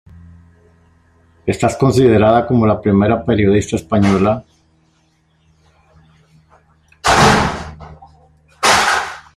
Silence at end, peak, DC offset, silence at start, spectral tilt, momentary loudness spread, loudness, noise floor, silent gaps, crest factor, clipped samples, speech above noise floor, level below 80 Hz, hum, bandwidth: 0.15 s; 0 dBFS; under 0.1%; 1.45 s; -5 dB/octave; 10 LU; -14 LUFS; -58 dBFS; none; 16 dB; under 0.1%; 45 dB; -40 dBFS; none; 14.5 kHz